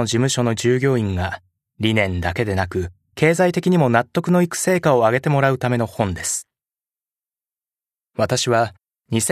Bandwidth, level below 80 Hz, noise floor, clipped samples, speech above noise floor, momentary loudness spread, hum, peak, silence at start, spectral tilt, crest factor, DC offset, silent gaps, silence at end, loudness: 14 kHz; -48 dBFS; under -90 dBFS; under 0.1%; over 72 dB; 9 LU; none; 0 dBFS; 0 s; -5 dB/octave; 20 dB; under 0.1%; none; 0 s; -19 LUFS